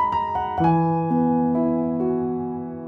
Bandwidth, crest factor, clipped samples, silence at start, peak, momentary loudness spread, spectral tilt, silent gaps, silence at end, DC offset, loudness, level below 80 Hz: 5 kHz; 14 dB; under 0.1%; 0 s; -8 dBFS; 6 LU; -10.5 dB/octave; none; 0 s; under 0.1%; -22 LUFS; -52 dBFS